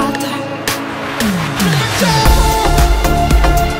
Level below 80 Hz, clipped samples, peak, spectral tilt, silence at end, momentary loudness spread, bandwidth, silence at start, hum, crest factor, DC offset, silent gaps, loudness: -16 dBFS; under 0.1%; 0 dBFS; -4.5 dB/octave; 0 s; 8 LU; 16.5 kHz; 0 s; none; 12 dB; under 0.1%; none; -14 LUFS